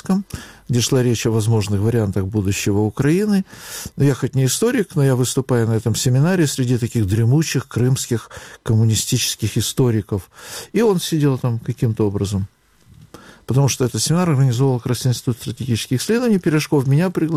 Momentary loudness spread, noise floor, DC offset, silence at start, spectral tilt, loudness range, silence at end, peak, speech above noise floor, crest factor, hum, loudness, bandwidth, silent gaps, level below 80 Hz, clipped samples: 7 LU; -48 dBFS; under 0.1%; 0.05 s; -5.5 dB/octave; 3 LU; 0 s; -8 dBFS; 30 dB; 10 dB; none; -18 LUFS; 16 kHz; none; -48 dBFS; under 0.1%